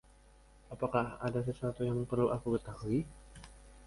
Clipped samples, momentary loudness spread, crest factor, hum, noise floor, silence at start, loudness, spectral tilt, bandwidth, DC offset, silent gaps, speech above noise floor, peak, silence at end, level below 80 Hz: under 0.1%; 22 LU; 20 dB; none; -61 dBFS; 0.7 s; -35 LUFS; -8 dB/octave; 11.5 kHz; under 0.1%; none; 27 dB; -16 dBFS; 0 s; -56 dBFS